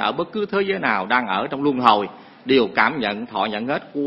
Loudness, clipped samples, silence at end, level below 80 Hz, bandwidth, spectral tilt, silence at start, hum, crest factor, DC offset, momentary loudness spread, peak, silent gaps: -20 LUFS; under 0.1%; 0 s; -60 dBFS; 7.2 kHz; -7 dB/octave; 0 s; none; 20 dB; under 0.1%; 8 LU; 0 dBFS; none